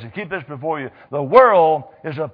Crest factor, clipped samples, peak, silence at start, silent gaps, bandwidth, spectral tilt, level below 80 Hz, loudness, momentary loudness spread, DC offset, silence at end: 18 dB; under 0.1%; 0 dBFS; 0 s; none; 5.2 kHz; -9 dB/octave; -58 dBFS; -16 LUFS; 16 LU; under 0.1%; 0.05 s